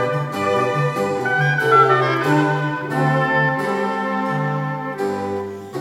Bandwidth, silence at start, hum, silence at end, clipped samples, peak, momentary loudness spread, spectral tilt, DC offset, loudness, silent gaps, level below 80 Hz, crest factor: 15 kHz; 0 s; none; 0 s; under 0.1%; -2 dBFS; 10 LU; -6.5 dB/octave; under 0.1%; -19 LUFS; none; -62 dBFS; 18 dB